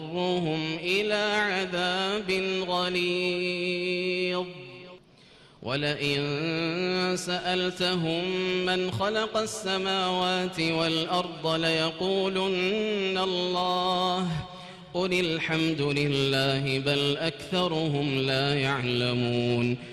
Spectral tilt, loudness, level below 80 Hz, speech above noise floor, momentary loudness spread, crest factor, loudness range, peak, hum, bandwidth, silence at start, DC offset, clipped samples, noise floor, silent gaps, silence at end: -5 dB/octave; -27 LUFS; -60 dBFS; 28 dB; 4 LU; 14 dB; 3 LU; -14 dBFS; none; 13.5 kHz; 0 s; under 0.1%; under 0.1%; -55 dBFS; none; 0 s